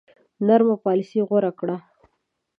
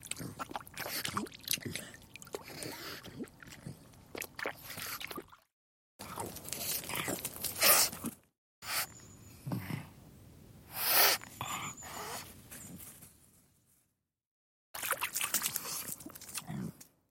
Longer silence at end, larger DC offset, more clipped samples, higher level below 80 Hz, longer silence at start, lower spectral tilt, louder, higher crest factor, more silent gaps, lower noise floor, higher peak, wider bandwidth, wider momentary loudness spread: first, 0.8 s vs 0.25 s; neither; neither; second, -74 dBFS vs -68 dBFS; first, 0.4 s vs 0 s; first, -9.5 dB/octave vs -1.5 dB/octave; first, -21 LUFS vs -34 LUFS; second, 20 dB vs 30 dB; second, none vs 5.53-5.99 s, 8.38-8.62 s, 14.27-14.74 s; second, -74 dBFS vs -80 dBFS; first, -4 dBFS vs -8 dBFS; second, 6.2 kHz vs 17 kHz; second, 12 LU vs 22 LU